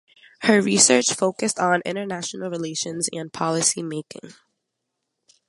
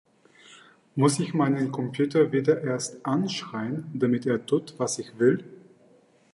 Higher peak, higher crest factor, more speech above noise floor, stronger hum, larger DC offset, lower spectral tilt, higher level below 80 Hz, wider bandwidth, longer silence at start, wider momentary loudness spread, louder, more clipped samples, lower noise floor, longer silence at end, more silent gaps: first, 0 dBFS vs -8 dBFS; about the same, 22 dB vs 20 dB; first, 57 dB vs 34 dB; neither; neither; second, -2.5 dB/octave vs -5.5 dB/octave; about the same, -68 dBFS vs -72 dBFS; about the same, 11.5 kHz vs 11.5 kHz; about the same, 0.4 s vs 0.5 s; first, 14 LU vs 9 LU; first, -21 LUFS vs -26 LUFS; neither; first, -79 dBFS vs -59 dBFS; first, 1.15 s vs 0.75 s; neither